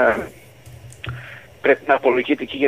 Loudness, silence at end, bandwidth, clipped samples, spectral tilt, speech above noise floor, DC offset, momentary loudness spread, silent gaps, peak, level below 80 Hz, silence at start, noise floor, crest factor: -19 LUFS; 0 s; 15.5 kHz; under 0.1%; -6 dB/octave; 24 dB; 0.2%; 19 LU; none; -4 dBFS; -50 dBFS; 0 s; -42 dBFS; 18 dB